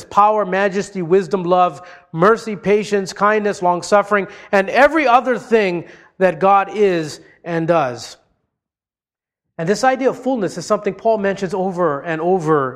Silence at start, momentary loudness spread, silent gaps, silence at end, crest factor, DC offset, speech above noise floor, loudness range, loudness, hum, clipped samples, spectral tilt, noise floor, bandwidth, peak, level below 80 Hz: 0 s; 9 LU; none; 0 s; 16 dB; under 0.1%; over 74 dB; 6 LU; -17 LUFS; none; under 0.1%; -5.5 dB/octave; under -90 dBFS; 13 kHz; 0 dBFS; -56 dBFS